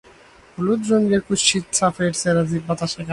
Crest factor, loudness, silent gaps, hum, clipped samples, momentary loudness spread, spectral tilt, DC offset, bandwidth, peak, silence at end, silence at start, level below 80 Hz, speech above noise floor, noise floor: 18 dB; -20 LUFS; none; none; under 0.1%; 7 LU; -4 dB/octave; under 0.1%; 11.5 kHz; -2 dBFS; 0 s; 0.6 s; -52 dBFS; 29 dB; -48 dBFS